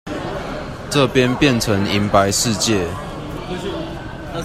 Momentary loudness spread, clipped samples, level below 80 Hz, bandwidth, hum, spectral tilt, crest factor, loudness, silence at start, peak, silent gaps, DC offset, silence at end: 14 LU; under 0.1%; -38 dBFS; 15.5 kHz; none; -4.5 dB/octave; 18 dB; -18 LUFS; 0.05 s; 0 dBFS; none; under 0.1%; 0 s